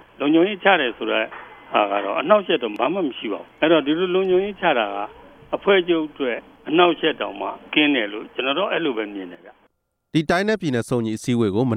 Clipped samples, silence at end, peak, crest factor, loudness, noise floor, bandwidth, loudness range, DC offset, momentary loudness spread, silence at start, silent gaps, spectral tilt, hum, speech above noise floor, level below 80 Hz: under 0.1%; 0 s; 0 dBFS; 20 dB; -21 LUFS; -65 dBFS; 12 kHz; 3 LU; under 0.1%; 12 LU; 0.2 s; none; -5.5 dB/octave; none; 45 dB; -58 dBFS